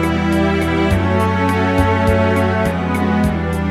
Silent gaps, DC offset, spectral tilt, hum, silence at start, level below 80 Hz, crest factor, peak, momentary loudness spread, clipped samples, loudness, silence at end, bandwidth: none; under 0.1%; -7 dB/octave; none; 0 s; -28 dBFS; 14 dB; 0 dBFS; 3 LU; under 0.1%; -16 LUFS; 0 s; 14.5 kHz